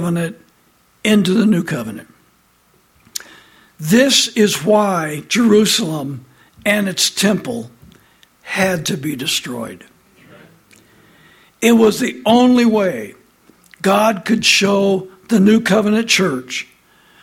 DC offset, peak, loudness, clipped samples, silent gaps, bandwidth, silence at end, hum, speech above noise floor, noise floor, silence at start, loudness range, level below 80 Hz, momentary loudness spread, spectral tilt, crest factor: under 0.1%; 0 dBFS; -15 LUFS; under 0.1%; none; 16.5 kHz; 0.6 s; none; 41 dB; -56 dBFS; 0 s; 7 LU; -56 dBFS; 17 LU; -4 dB/octave; 16 dB